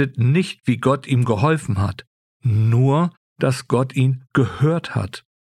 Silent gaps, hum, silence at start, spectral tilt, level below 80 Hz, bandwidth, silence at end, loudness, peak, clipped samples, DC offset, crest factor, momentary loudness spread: 2.07-2.40 s, 3.17-3.36 s; none; 0 s; -7.5 dB/octave; -52 dBFS; 12 kHz; 0.3 s; -20 LUFS; -4 dBFS; under 0.1%; under 0.1%; 16 dB; 9 LU